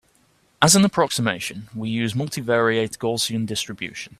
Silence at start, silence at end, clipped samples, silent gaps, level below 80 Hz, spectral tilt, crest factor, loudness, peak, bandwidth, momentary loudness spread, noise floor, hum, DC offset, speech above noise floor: 0.6 s; 0.15 s; under 0.1%; none; -56 dBFS; -3.5 dB/octave; 22 dB; -21 LUFS; 0 dBFS; 15.5 kHz; 13 LU; -61 dBFS; none; under 0.1%; 39 dB